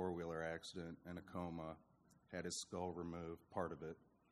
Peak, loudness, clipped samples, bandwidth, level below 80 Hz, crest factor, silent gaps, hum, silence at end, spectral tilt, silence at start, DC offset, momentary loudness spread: -28 dBFS; -49 LUFS; under 0.1%; 13.5 kHz; -72 dBFS; 20 dB; none; none; 0.3 s; -4.5 dB/octave; 0 s; under 0.1%; 8 LU